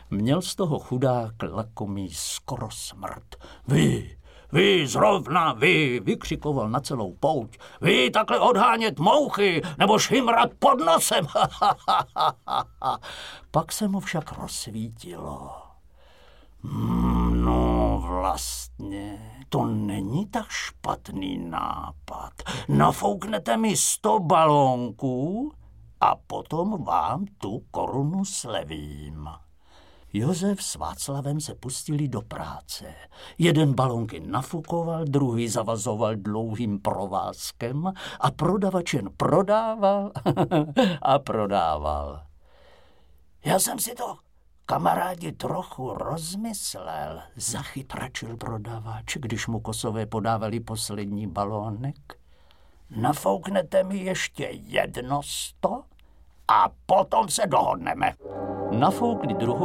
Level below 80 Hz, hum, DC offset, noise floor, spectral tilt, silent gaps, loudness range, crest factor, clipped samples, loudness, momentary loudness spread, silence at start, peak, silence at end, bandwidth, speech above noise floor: -42 dBFS; none; 0.1%; -59 dBFS; -4.5 dB/octave; none; 9 LU; 22 dB; under 0.1%; -25 LUFS; 15 LU; 0 s; -4 dBFS; 0 s; 16.5 kHz; 34 dB